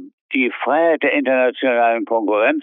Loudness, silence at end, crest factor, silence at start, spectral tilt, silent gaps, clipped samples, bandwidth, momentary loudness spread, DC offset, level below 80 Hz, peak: -17 LUFS; 0 s; 14 dB; 0 s; -7.5 dB/octave; 0.13-0.29 s; under 0.1%; 3.9 kHz; 4 LU; under 0.1%; -76 dBFS; -4 dBFS